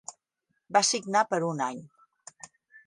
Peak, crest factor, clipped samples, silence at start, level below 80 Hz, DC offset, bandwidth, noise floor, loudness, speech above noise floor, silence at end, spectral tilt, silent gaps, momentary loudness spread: -8 dBFS; 22 dB; under 0.1%; 0.1 s; -80 dBFS; under 0.1%; 11.5 kHz; -79 dBFS; -27 LUFS; 52 dB; 0.1 s; -2.5 dB/octave; none; 23 LU